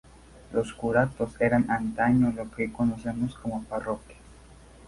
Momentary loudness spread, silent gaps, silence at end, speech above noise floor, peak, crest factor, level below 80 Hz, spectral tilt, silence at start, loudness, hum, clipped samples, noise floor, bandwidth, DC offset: 9 LU; none; 0 s; 24 dB; -8 dBFS; 20 dB; -50 dBFS; -8 dB/octave; 0.35 s; -27 LUFS; none; under 0.1%; -51 dBFS; 11.5 kHz; under 0.1%